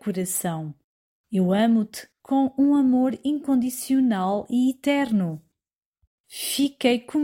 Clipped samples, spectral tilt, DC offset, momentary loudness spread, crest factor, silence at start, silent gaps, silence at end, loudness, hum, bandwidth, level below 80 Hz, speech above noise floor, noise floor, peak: under 0.1%; -5 dB/octave; under 0.1%; 12 LU; 16 dB; 0.05 s; 0.84-1.24 s, 5.75-5.79 s, 5.86-5.93 s, 6.07-6.24 s; 0 s; -23 LUFS; none; 16.5 kHz; -66 dBFS; over 68 dB; under -90 dBFS; -8 dBFS